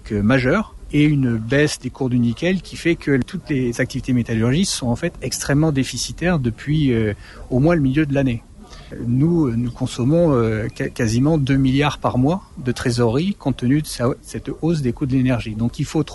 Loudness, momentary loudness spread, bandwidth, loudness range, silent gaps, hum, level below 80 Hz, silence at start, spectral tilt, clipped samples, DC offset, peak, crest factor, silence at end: -19 LUFS; 7 LU; 11.5 kHz; 2 LU; none; none; -38 dBFS; 0.05 s; -6 dB/octave; under 0.1%; under 0.1%; -4 dBFS; 14 dB; 0 s